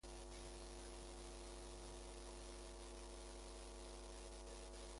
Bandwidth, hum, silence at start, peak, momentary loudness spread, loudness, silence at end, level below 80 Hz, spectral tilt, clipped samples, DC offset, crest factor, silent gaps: 11.5 kHz; none; 0.05 s; -42 dBFS; 1 LU; -56 LUFS; 0 s; -58 dBFS; -3.5 dB/octave; under 0.1%; under 0.1%; 12 dB; none